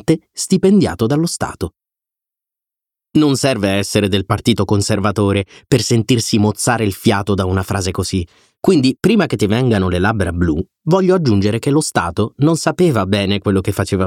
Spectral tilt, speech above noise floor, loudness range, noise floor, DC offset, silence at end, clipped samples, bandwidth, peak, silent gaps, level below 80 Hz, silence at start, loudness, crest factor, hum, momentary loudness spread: -5.5 dB/octave; 72 dB; 3 LU; -87 dBFS; under 0.1%; 0 s; under 0.1%; 16.5 kHz; 0 dBFS; none; -40 dBFS; 0.1 s; -16 LUFS; 14 dB; none; 6 LU